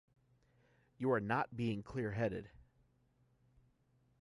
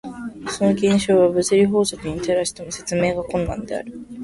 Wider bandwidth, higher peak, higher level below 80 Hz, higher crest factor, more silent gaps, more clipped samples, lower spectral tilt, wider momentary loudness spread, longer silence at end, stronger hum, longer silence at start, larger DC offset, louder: about the same, 11.5 kHz vs 11.5 kHz; second, -22 dBFS vs -4 dBFS; second, -68 dBFS vs -44 dBFS; about the same, 20 dB vs 16 dB; neither; neither; first, -8 dB/octave vs -5 dB/octave; second, 6 LU vs 13 LU; first, 1.65 s vs 0 s; neither; first, 1 s vs 0.05 s; neither; second, -39 LUFS vs -20 LUFS